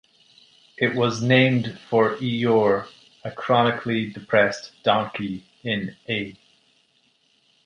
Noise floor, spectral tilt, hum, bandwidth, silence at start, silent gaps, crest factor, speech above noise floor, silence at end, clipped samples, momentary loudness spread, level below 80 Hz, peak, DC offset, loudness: -64 dBFS; -6 dB/octave; none; 10 kHz; 0.8 s; none; 20 dB; 42 dB; 1.35 s; under 0.1%; 14 LU; -62 dBFS; -4 dBFS; under 0.1%; -22 LUFS